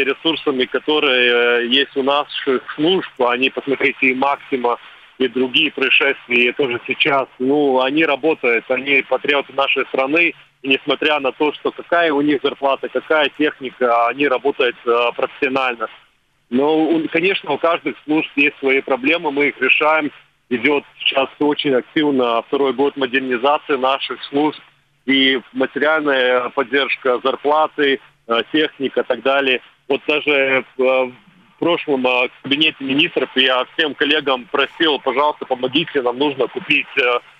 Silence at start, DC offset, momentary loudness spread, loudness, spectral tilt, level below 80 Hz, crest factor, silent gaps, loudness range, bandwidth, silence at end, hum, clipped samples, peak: 0 s; under 0.1%; 6 LU; -17 LUFS; -5.5 dB/octave; -66 dBFS; 18 dB; none; 2 LU; 6.6 kHz; 0.2 s; none; under 0.1%; 0 dBFS